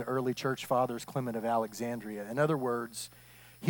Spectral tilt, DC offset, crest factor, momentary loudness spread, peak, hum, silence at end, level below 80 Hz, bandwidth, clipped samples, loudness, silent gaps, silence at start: -5.5 dB/octave; under 0.1%; 18 dB; 12 LU; -16 dBFS; none; 0 s; -70 dBFS; 18 kHz; under 0.1%; -33 LUFS; none; 0 s